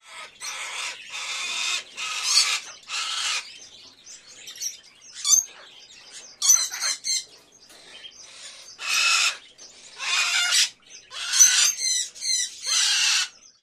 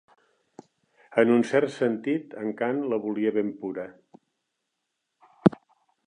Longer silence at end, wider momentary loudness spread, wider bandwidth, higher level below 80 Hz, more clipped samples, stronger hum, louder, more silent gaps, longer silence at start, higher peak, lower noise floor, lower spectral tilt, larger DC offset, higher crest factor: second, 0.35 s vs 0.55 s; first, 23 LU vs 13 LU; first, 15.5 kHz vs 10 kHz; second, -74 dBFS vs -66 dBFS; neither; neither; first, -21 LUFS vs -26 LUFS; neither; second, 0.05 s vs 1.1 s; about the same, -2 dBFS vs -2 dBFS; second, -51 dBFS vs -81 dBFS; second, 5 dB/octave vs -7.5 dB/octave; neither; about the same, 24 dB vs 26 dB